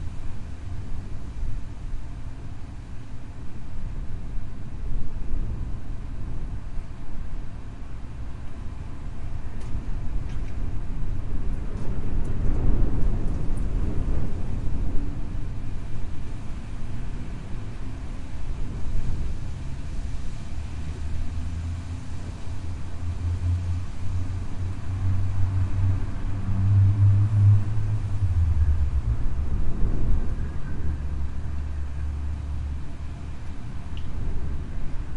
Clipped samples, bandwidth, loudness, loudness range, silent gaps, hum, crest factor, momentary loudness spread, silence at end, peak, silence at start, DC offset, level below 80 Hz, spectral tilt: under 0.1%; 7.2 kHz; -30 LUFS; 15 LU; none; none; 16 dB; 13 LU; 0 s; -6 dBFS; 0 s; under 0.1%; -30 dBFS; -8 dB/octave